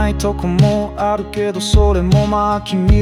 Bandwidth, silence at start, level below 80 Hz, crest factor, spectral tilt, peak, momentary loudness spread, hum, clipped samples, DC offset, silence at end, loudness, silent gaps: 13 kHz; 0 s; -20 dBFS; 12 dB; -6.5 dB/octave; -2 dBFS; 6 LU; none; under 0.1%; under 0.1%; 0 s; -15 LUFS; none